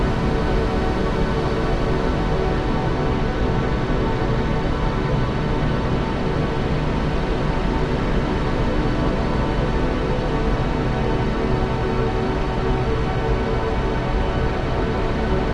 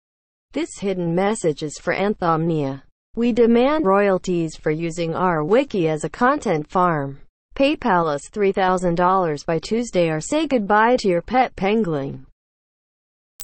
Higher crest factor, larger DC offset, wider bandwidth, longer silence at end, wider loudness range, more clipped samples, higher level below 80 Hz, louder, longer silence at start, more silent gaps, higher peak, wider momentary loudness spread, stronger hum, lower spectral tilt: about the same, 12 dB vs 16 dB; neither; about the same, 9.6 kHz vs 8.8 kHz; about the same, 0 s vs 0 s; about the same, 1 LU vs 2 LU; neither; first, -24 dBFS vs -46 dBFS; about the same, -22 LUFS vs -20 LUFS; second, 0 s vs 0.55 s; second, none vs 2.92-3.14 s, 7.29-7.49 s, 12.32-13.39 s; second, -8 dBFS vs -4 dBFS; second, 1 LU vs 9 LU; neither; first, -7.5 dB/octave vs -6 dB/octave